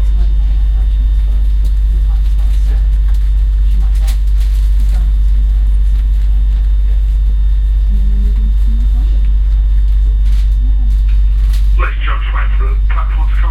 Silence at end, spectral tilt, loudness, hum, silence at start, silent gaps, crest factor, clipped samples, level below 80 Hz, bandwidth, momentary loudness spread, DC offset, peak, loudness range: 0 s; -7 dB/octave; -14 LUFS; none; 0 s; none; 8 dB; under 0.1%; -10 dBFS; 4.3 kHz; 1 LU; under 0.1%; -2 dBFS; 1 LU